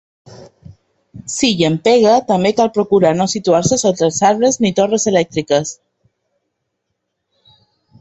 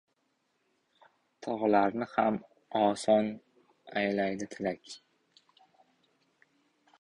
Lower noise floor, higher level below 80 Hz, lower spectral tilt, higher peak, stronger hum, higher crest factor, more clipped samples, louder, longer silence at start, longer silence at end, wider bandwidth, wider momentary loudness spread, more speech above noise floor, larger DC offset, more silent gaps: second, -73 dBFS vs -77 dBFS; first, -52 dBFS vs -72 dBFS; about the same, -4.5 dB/octave vs -5.5 dB/octave; first, 0 dBFS vs -12 dBFS; neither; about the same, 16 dB vs 20 dB; neither; first, -14 LUFS vs -30 LUFS; second, 0.3 s vs 1.4 s; first, 2.3 s vs 2.05 s; second, 8.6 kHz vs 11 kHz; second, 5 LU vs 17 LU; first, 60 dB vs 47 dB; neither; neither